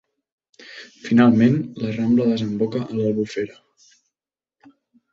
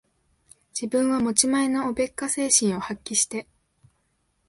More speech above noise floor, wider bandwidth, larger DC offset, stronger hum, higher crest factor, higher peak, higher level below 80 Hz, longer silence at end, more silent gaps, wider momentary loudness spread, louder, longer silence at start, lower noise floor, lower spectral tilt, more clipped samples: first, over 71 dB vs 47 dB; second, 7.2 kHz vs 11.5 kHz; neither; neither; about the same, 20 dB vs 22 dB; about the same, -2 dBFS vs -4 dBFS; about the same, -60 dBFS vs -60 dBFS; first, 1.6 s vs 1.05 s; neither; first, 21 LU vs 11 LU; first, -20 LUFS vs -23 LUFS; second, 0.6 s vs 0.75 s; first, under -90 dBFS vs -71 dBFS; first, -8 dB/octave vs -2.5 dB/octave; neither